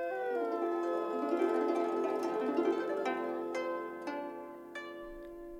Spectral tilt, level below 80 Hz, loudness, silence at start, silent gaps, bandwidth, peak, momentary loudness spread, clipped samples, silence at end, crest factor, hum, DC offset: -5 dB/octave; -66 dBFS; -35 LUFS; 0 s; none; 14 kHz; -20 dBFS; 14 LU; under 0.1%; 0 s; 16 dB; 50 Hz at -80 dBFS; under 0.1%